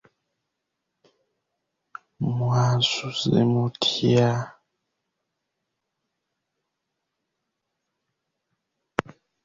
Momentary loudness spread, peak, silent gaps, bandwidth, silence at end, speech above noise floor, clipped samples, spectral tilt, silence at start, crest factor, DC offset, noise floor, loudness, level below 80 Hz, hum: 11 LU; 0 dBFS; none; 7.8 kHz; 0.45 s; 59 dB; under 0.1%; -6 dB/octave; 2.2 s; 28 dB; under 0.1%; -81 dBFS; -23 LUFS; -60 dBFS; none